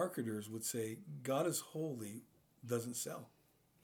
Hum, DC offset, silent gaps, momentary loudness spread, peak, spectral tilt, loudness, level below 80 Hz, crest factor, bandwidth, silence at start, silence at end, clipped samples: none; under 0.1%; none; 14 LU; -24 dBFS; -4.5 dB/octave; -42 LUFS; -86 dBFS; 18 dB; over 20 kHz; 0 s; 0.55 s; under 0.1%